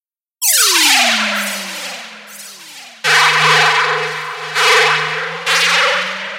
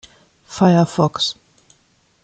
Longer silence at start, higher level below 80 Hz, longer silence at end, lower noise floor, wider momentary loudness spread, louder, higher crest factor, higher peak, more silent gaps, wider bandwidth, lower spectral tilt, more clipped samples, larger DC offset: about the same, 0.4 s vs 0.5 s; second, -68 dBFS vs -58 dBFS; second, 0 s vs 0.9 s; second, -36 dBFS vs -59 dBFS; about the same, 22 LU vs 20 LU; first, -12 LUFS vs -17 LUFS; about the same, 16 dB vs 16 dB; about the same, 0 dBFS vs -2 dBFS; neither; first, over 20 kHz vs 9 kHz; second, 0 dB/octave vs -6 dB/octave; neither; neither